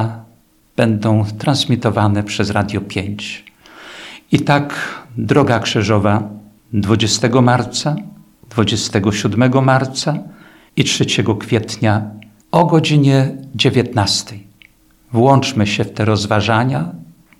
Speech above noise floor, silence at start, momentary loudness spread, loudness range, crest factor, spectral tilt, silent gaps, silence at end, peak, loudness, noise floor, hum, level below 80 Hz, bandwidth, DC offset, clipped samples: 36 dB; 0 s; 13 LU; 3 LU; 16 dB; -5.5 dB/octave; none; 0.35 s; 0 dBFS; -16 LUFS; -51 dBFS; none; -50 dBFS; 13.5 kHz; under 0.1%; under 0.1%